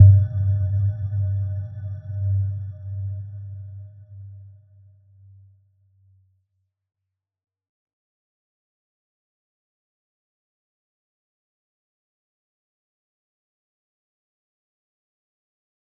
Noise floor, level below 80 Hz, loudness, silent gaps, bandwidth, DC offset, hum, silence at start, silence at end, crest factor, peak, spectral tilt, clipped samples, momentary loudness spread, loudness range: -75 dBFS; -56 dBFS; -24 LUFS; none; 1.6 kHz; under 0.1%; none; 0 s; 11.5 s; 26 dB; -2 dBFS; -13 dB/octave; under 0.1%; 20 LU; 22 LU